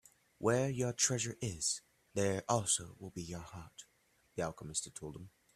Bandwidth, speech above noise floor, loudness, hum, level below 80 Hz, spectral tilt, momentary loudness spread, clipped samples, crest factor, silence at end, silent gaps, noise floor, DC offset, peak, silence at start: 14 kHz; 31 dB; -36 LUFS; none; -66 dBFS; -3.5 dB/octave; 17 LU; under 0.1%; 24 dB; 0.25 s; none; -68 dBFS; under 0.1%; -14 dBFS; 0.4 s